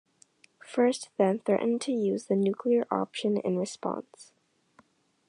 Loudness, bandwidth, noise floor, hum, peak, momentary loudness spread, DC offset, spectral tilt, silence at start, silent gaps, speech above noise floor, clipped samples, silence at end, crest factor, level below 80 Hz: -28 LUFS; 11 kHz; -64 dBFS; none; -12 dBFS; 8 LU; under 0.1%; -6 dB/octave; 0.7 s; none; 36 dB; under 0.1%; 1.05 s; 18 dB; -82 dBFS